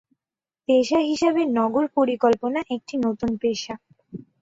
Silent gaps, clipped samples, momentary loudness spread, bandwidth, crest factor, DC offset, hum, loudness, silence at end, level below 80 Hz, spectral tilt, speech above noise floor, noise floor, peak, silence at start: none; under 0.1%; 16 LU; 8 kHz; 16 dB; under 0.1%; none; -22 LUFS; 0.2 s; -60 dBFS; -5 dB/octave; over 68 dB; under -90 dBFS; -8 dBFS; 0.7 s